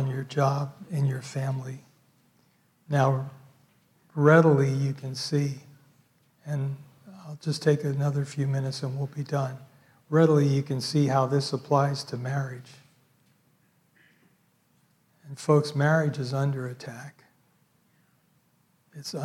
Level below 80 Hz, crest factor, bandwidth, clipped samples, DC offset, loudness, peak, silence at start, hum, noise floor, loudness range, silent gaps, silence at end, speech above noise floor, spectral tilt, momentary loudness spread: -74 dBFS; 22 dB; 12.5 kHz; under 0.1%; under 0.1%; -26 LUFS; -6 dBFS; 0 s; none; -67 dBFS; 7 LU; none; 0 s; 42 dB; -7 dB/octave; 20 LU